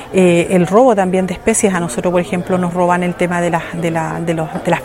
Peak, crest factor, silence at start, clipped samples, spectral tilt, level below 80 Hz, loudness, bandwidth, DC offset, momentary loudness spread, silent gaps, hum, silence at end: 0 dBFS; 14 dB; 0 s; under 0.1%; -5.5 dB/octave; -44 dBFS; -15 LUFS; 16 kHz; under 0.1%; 8 LU; none; none; 0 s